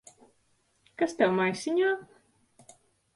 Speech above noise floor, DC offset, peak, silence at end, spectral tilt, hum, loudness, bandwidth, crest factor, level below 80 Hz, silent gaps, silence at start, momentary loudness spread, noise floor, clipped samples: 43 dB; under 0.1%; -10 dBFS; 1.1 s; -5 dB/octave; none; -28 LUFS; 11.5 kHz; 20 dB; -74 dBFS; none; 1 s; 9 LU; -70 dBFS; under 0.1%